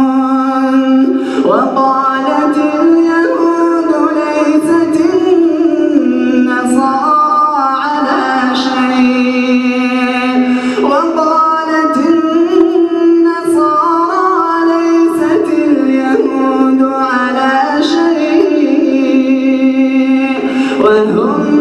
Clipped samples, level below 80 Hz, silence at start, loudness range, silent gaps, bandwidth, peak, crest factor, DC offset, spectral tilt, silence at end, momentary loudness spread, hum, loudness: under 0.1%; -56 dBFS; 0 s; 1 LU; none; 12 kHz; 0 dBFS; 10 dB; under 0.1%; -5 dB/octave; 0 s; 3 LU; none; -11 LUFS